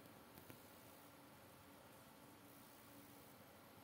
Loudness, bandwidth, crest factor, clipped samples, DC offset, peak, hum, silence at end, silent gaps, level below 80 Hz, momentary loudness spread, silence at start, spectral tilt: -62 LUFS; 16 kHz; 24 dB; under 0.1%; under 0.1%; -40 dBFS; none; 0 s; none; -86 dBFS; 2 LU; 0 s; -4 dB/octave